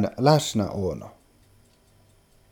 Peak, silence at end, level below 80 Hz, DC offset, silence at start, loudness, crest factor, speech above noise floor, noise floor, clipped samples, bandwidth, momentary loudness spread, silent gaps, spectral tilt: -4 dBFS; 1.4 s; -54 dBFS; under 0.1%; 0 s; -23 LUFS; 24 dB; 35 dB; -59 dBFS; under 0.1%; 17.5 kHz; 18 LU; none; -5.5 dB/octave